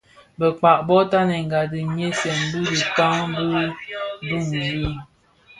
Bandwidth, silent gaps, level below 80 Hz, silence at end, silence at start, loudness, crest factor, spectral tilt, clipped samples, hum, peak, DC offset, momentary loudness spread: 11.5 kHz; none; -46 dBFS; 0.55 s; 0.4 s; -21 LUFS; 18 dB; -5 dB/octave; under 0.1%; none; -2 dBFS; under 0.1%; 10 LU